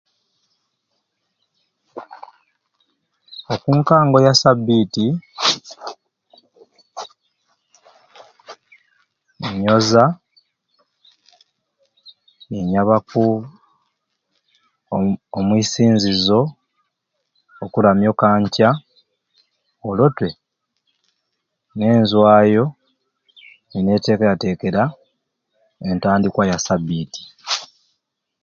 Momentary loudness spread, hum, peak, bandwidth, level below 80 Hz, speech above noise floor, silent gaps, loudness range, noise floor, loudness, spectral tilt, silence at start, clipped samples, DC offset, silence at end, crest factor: 22 LU; none; 0 dBFS; 7.6 kHz; -52 dBFS; 60 dB; none; 6 LU; -75 dBFS; -17 LUFS; -5.5 dB/octave; 1.95 s; under 0.1%; under 0.1%; 0.8 s; 20 dB